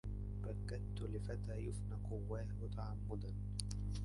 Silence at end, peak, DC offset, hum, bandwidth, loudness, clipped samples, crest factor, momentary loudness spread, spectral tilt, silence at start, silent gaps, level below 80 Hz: 0 s; -22 dBFS; under 0.1%; 50 Hz at -45 dBFS; 11.5 kHz; -46 LUFS; under 0.1%; 20 dB; 1 LU; -6.5 dB/octave; 0.05 s; none; -48 dBFS